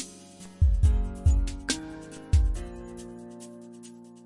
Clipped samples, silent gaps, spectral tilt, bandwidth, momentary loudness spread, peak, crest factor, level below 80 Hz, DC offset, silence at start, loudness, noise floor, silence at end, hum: under 0.1%; none; -5.5 dB/octave; 11.5 kHz; 21 LU; -10 dBFS; 16 dB; -30 dBFS; under 0.1%; 0 s; -27 LUFS; -47 dBFS; 0.25 s; none